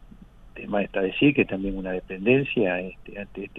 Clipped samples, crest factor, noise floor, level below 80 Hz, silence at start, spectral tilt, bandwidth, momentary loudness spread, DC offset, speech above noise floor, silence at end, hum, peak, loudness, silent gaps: under 0.1%; 20 dB; -47 dBFS; -46 dBFS; 0 s; -9 dB/octave; 4 kHz; 16 LU; under 0.1%; 23 dB; 0 s; none; -6 dBFS; -24 LUFS; none